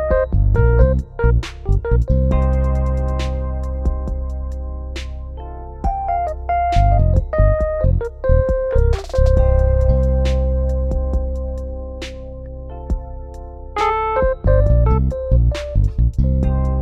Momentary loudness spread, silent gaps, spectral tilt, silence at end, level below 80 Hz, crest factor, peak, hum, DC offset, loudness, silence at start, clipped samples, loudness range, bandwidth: 14 LU; none; -8.5 dB/octave; 0 s; -18 dBFS; 16 dB; -2 dBFS; none; under 0.1%; -19 LUFS; 0 s; under 0.1%; 7 LU; 7.4 kHz